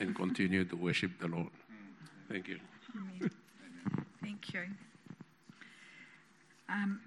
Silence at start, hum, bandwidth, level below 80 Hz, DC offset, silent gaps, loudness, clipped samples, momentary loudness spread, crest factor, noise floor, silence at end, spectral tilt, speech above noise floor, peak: 0 s; none; 11.5 kHz; -78 dBFS; under 0.1%; none; -39 LUFS; under 0.1%; 22 LU; 20 dB; -65 dBFS; 0 s; -6 dB/octave; 27 dB; -20 dBFS